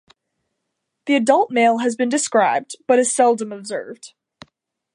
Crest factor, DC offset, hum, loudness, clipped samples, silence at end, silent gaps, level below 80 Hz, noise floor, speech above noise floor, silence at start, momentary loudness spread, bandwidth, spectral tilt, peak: 18 dB; under 0.1%; none; -18 LUFS; under 0.1%; 0.9 s; none; -76 dBFS; -77 dBFS; 59 dB; 1.05 s; 14 LU; 11.5 kHz; -3 dB/octave; -2 dBFS